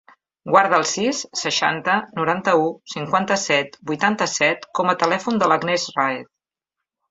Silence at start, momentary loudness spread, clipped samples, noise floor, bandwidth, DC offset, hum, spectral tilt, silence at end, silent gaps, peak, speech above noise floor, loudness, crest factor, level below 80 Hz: 0.45 s; 5 LU; under 0.1%; -84 dBFS; 8 kHz; under 0.1%; none; -3 dB/octave; 0.85 s; none; -2 dBFS; 64 dB; -20 LUFS; 20 dB; -66 dBFS